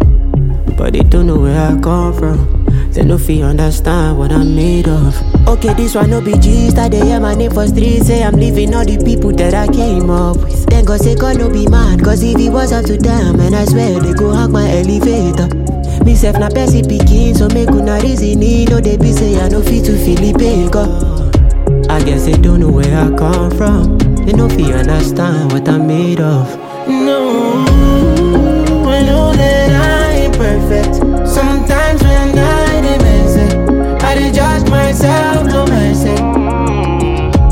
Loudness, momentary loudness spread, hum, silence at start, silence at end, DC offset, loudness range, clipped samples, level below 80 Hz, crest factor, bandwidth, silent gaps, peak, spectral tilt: -11 LUFS; 3 LU; none; 0 s; 0 s; under 0.1%; 1 LU; under 0.1%; -12 dBFS; 8 dB; 16.5 kHz; none; 0 dBFS; -6.5 dB/octave